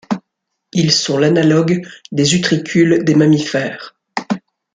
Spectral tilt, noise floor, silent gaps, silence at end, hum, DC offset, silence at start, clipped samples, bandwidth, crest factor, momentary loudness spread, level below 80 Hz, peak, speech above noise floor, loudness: -5 dB/octave; -75 dBFS; none; 0.35 s; none; under 0.1%; 0.1 s; under 0.1%; 9.4 kHz; 14 dB; 13 LU; -54 dBFS; 0 dBFS; 61 dB; -15 LUFS